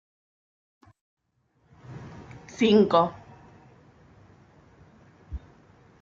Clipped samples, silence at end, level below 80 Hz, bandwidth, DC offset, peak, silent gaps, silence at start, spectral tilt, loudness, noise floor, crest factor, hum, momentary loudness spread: under 0.1%; 0.65 s; -54 dBFS; 7.4 kHz; under 0.1%; -8 dBFS; none; 1.9 s; -6.5 dB/octave; -22 LUFS; -69 dBFS; 22 dB; none; 26 LU